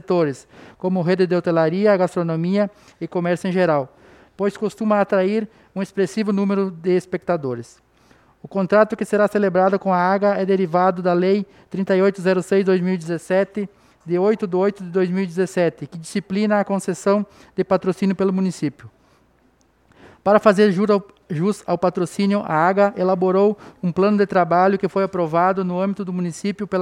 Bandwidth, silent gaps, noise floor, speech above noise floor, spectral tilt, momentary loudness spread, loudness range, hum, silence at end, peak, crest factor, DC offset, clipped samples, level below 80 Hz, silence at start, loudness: 12 kHz; none; -59 dBFS; 40 dB; -7 dB/octave; 9 LU; 4 LU; none; 0 s; 0 dBFS; 20 dB; under 0.1%; under 0.1%; -62 dBFS; 0.1 s; -20 LUFS